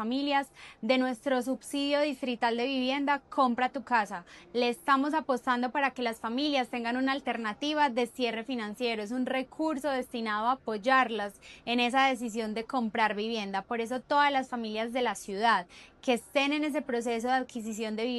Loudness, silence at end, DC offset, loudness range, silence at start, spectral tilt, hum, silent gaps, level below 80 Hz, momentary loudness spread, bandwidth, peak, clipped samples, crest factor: -30 LUFS; 0 s; under 0.1%; 2 LU; 0 s; -3.5 dB/octave; none; none; -68 dBFS; 7 LU; 12.5 kHz; -12 dBFS; under 0.1%; 18 dB